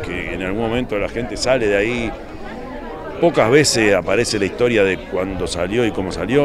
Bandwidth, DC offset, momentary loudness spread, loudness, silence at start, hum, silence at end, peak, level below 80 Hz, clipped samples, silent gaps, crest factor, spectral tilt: 14 kHz; under 0.1%; 17 LU; -18 LUFS; 0 s; none; 0 s; 0 dBFS; -36 dBFS; under 0.1%; none; 18 dB; -4.5 dB/octave